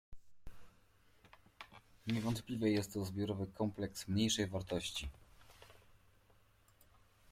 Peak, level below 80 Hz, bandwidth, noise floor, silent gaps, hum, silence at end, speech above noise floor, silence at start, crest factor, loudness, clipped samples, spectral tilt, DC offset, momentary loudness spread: -22 dBFS; -62 dBFS; 16.5 kHz; -70 dBFS; none; none; 1.4 s; 32 dB; 0.1 s; 20 dB; -39 LUFS; under 0.1%; -5 dB/octave; under 0.1%; 21 LU